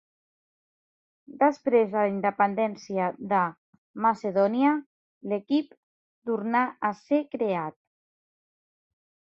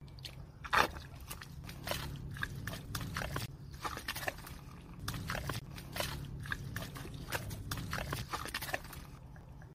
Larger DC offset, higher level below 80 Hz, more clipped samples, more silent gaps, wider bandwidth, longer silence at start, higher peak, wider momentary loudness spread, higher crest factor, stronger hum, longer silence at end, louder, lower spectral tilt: neither; second, -76 dBFS vs -52 dBFS; neither; first, 3.58-3.94 s, 4.86-5.21 s, 5.77-6.22 s vs none; second, 7.4 kHz vs 16 kHz; first, 1.3 s vs 0 s; about the same, -8 dBFS vs -10 dBFS; about the same, 10 LU vs 12 LU; second, 20 dB vs 32 dB; neither; first, 1.65 s vs 0 s; first, -26 LUFS vs -40 LUFS; first, -7.5 dB/octave vs -4 dB/octave